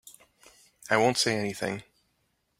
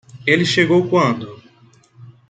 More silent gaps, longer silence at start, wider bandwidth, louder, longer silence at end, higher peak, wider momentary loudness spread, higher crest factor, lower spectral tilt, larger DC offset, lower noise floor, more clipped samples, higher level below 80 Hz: neither; about the same, 0.05 s vs 0.15 s; first, 16 kHz vs 9.2 kHz; second, -27 LUFS vs -16 LUFS; first, 0.8 s vs 0.2 s; second, -6 dBFS vs -2 dBFS; first, 15 LU vs 11 LU; first, 24 dB vs 16 dB; second, -3.5 dB/octave vs -5.5 dB/octave; neither; first, -74 dBFS vs -51 dBFS; neither; second, -68 dBFS vs -58 dBFS